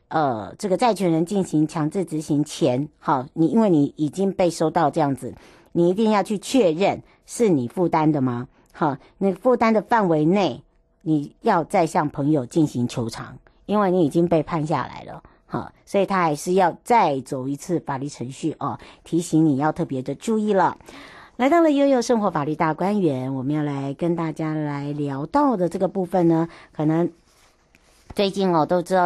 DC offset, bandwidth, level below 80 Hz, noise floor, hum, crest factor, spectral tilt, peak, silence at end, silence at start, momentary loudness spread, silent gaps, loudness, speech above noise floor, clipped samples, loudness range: under 0.1%; 12.5 kHz; -56 dBFS; -57 dBFS; none; 14 dB; -6.5 dB/octave; -8 dBFS; 0 s; 0.1 s; 11 LU; none; -22 LUFS; 36 dB; under 0.1%; 3 LU